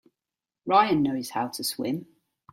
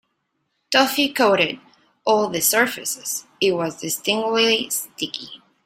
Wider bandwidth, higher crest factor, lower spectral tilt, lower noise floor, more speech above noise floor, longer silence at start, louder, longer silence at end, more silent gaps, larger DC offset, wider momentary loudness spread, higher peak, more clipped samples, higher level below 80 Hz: about the same, 16.5 kHz vs 16 kHz; about the same, 22 dB vs 18 dB; first, -4.5 dB/octave vs -2 dB/octave; first, -90 dBFS vs -73 dBFS; first, 65 dB vs 52 dB; about the same, 0.65 s vs 0.7 s; second, -26 LUFS vs -20 LUFS; first, 0.5 s vs 0.3 s; neither; neither; about the same, 12 LU vs 11 LU; second, -6 dBFS vs -2 dBFS; neither; about the same, -66 dBFS vs -66 dBFS